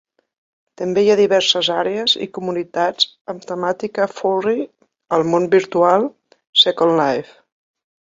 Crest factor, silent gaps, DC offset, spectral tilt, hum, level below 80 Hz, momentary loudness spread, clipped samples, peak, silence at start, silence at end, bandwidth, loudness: 18 dB; 3.21-3.25 s, 6.49-6.53 s; under 0.1%; -4 dB/octave; none; -64 dBFS; 11 LU; under 0.1%; 0 dBFS; 0.8 s; 0.8 s; 7.8 kHz; -17 LUFS